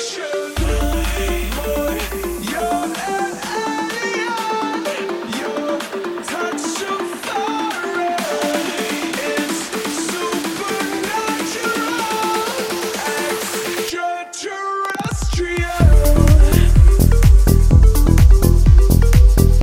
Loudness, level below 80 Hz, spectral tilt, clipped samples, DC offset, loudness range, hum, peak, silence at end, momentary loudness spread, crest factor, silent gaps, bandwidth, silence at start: -18 LUFS; -18 dBFS; -5 dB/octave; under 0.1%; under 0.1%; 9 LU; none; 0 dBFS; 0 s; 11 LU; 14 dB; none; 17 kHz; 0 s